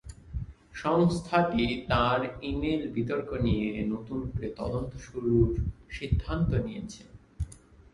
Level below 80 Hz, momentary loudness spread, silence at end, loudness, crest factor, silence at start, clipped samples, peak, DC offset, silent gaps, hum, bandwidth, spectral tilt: -40 dBFS; 15 LU; 0.35 s; -29 LUFS; 20 dB; 0.05 s; under 0.1%; -10 dBFS; under 0.1%; none; none; 11.5 kHz; -7 dB/octave